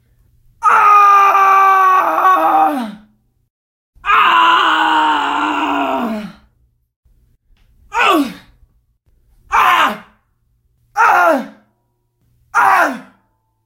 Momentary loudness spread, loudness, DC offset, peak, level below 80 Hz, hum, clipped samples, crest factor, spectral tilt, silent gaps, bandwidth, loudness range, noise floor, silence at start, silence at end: 15 LU; -12 LUFS; under 0.1%; 0 dBFS; -52 dBFS; none; under 0.1%; 14 dB; -2.5 dB/octave; 3.50-3.93 s, 6.96-7.03 s; 16 kHz; 9 LU; -64 dBFS; 0.6 s; 0.65 s